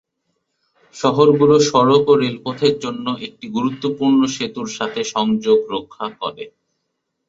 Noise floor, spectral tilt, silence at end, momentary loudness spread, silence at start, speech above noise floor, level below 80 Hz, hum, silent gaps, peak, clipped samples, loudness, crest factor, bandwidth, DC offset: -74 dBFS; -5.5 dB/octave; 0.8 s; 14 LU; 0.95 s; 57 dB; -58 dBFS; none; none; -2 dBFS; under 0.1%; -17 LUFS; 16 dB; 7.8 kHz; under 0.1%